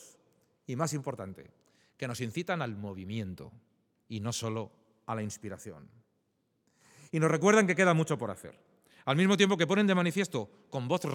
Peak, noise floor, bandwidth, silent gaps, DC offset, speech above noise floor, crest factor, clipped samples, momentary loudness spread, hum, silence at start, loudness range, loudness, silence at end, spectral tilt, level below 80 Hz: -8 dBFS; -77 dBFS; 16.5 kHz; none; under 0.1%; 46 dB; 24 dB; under 0.1%; 20 LU; none; 0 s; 13 LU; -30 LUFS; 0 s; -5 dB/octave; -76 dBFS